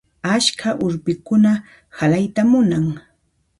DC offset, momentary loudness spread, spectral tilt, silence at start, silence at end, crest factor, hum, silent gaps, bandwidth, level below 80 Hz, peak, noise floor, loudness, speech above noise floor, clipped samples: under 0.1%; 8 LU; -5 dB/octave; 0.25 s; 0.6 s; 16 dB; none; none; 11.5 kHz; -52 dBFS; -2 dBFS; -64 dBFS; -18 LUFS; 47 dB; under 0.1%